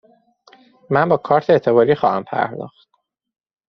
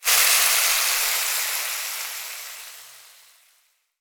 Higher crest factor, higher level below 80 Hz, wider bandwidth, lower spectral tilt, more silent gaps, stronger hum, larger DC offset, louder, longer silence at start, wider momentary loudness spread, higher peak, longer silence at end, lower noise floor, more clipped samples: about the same, 18 dB vs 20 dB; first, -60 dBFS vs -66 dBFS; second, 6.2 kHz vs over 20 kHz; first, -5.5 dB/octave vs 5 dB/octave; neither; neither; neither; about the same, -17 LUFS vs -19 LUFS; first, 0.9 s vs 0 s; second, 10 LU vs 21 LU; about the same, -2 dBFS vs -4 dBFS; about the same, 1 s vs 1 s; second, -53 dBFS vs -65 dBFS; neither